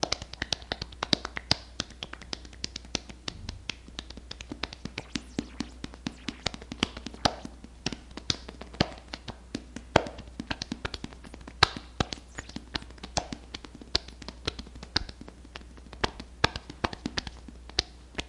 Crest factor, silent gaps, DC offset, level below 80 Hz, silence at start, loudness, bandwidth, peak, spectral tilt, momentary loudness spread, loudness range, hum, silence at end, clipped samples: 34 dB; none; under 0.1%; -46 dBFS; 0 s; -33 LUFS; 11.5 kHz; 0 dBFS; -3.5 dB/octave; 15 LU; 7 LU; none; 0 s; under 0.1%